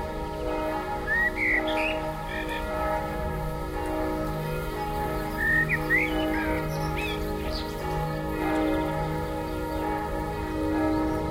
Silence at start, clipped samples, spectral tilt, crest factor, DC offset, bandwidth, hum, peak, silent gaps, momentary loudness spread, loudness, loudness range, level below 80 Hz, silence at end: 0 s; under 0.1%; -6 dB/octave; 16 dB; under 0.1%; 16 kHz; none; -12 dBFS; none; 8 LU; -28 LUFS; 3 LU; -38 dBFS; 0 s